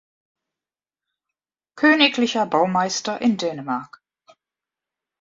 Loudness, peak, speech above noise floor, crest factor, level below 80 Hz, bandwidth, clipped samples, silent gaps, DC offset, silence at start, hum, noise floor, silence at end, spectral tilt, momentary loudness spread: -20 LUFS; -2 dBFS; over 70 dB; 22 dB; -70 dBFS; 7.8 kHz; under 0.1%; none; under 0.1%; 1.75 s; none; under -90 dBFS; 1.35 s; -3.5 dB/octave; 12 LU